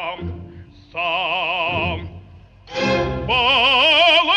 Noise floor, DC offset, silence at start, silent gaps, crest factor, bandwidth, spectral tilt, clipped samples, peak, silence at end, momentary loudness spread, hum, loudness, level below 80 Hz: -44 dBFS; under 0.1%; 0 s; none; 16 dB; 9.8 kHz; -4 dB/octave; under 0.1%; -4 dBFS; 0 s; 20 LU; none; -16 LUFS; -40 dBFS